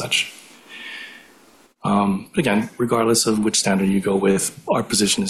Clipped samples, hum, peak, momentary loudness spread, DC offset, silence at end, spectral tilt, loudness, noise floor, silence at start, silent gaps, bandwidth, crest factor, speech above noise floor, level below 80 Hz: under 0.1%; none; -6 dBFS; 16 LU; under 0.1%; 0 s; -3.5 dB/octave; -19 LUFS; -52 dBFS; 0 s; none; 14.5 kHz; 14 dB; 33 dB; -54 dBFS